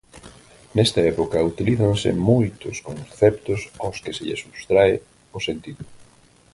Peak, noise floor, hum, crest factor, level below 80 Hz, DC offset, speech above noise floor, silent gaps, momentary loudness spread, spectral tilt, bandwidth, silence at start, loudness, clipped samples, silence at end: -2 dBFS; -53 dBFS; none; 20 dB; -46 dBFS; under 0.1%; 33 dB; none; 15 LU; -6 dB/octave; 11.5 kHz; 0.15 s; -21 LUFS; under 0.1%; 0.5 s